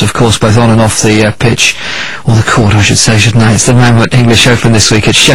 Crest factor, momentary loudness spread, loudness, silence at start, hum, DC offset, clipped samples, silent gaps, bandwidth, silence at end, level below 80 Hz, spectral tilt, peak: 6 dB; 4 LU; -6 LUFS; 0 s; none; under 0.1%; 2%; none; 16 kHz; 0 s; -26 dBFS; -4 dB/octave; 0 dBFS